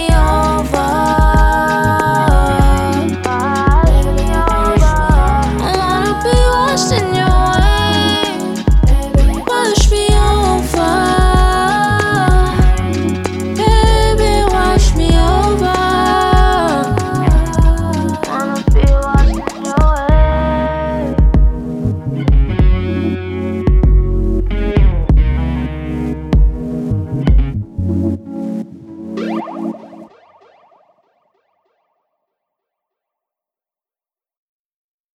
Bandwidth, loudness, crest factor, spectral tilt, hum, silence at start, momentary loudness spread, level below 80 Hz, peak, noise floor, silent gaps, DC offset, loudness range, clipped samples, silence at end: 13 kHz; -14 LUFS; 12 dB; -5.5 dB/octave; none; 0 s; 8 LU; -16 dBFS; 0 dBFS; under -90 dBFS; none; under 0.1%; 7 LU; under 0.1%; 5.1 s